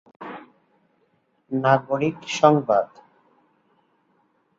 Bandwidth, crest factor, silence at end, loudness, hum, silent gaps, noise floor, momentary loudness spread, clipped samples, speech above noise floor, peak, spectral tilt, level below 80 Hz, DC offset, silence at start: 7.8 kHz; 22 dB; 1.75 s; -21 LUFS; none; none; -67 dBFS; 21 LU; under 0.1%; 47 dB; -2 dBFS; -6 dB/octave; -70 dBFS; under 0.1%; 0.2 s